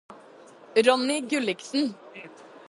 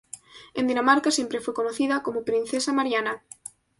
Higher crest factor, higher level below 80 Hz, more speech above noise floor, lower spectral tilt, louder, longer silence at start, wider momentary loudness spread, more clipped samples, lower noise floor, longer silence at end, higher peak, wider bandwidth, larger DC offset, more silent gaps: about the same, 22 dB vs 20 dB; second, -78 dBFS vs -66 dBFS; first, 25 dB vs 21 dB; about the same, -3 dB/octave vs -2.5 dB/octave; about the same, -25 LUFS vs -24 LUFS; about the same, 0.1 s vs 0.15 s; first, 23 LU vs 20 LU; neither; first, -50 dBFS vs -46 dBFS; second, 0.4 s vs 0.6 s; about the same, -6 dBFS vs -6 dBFS; about the same, 11.5 kHz vs 11.5 kHz; neither; neither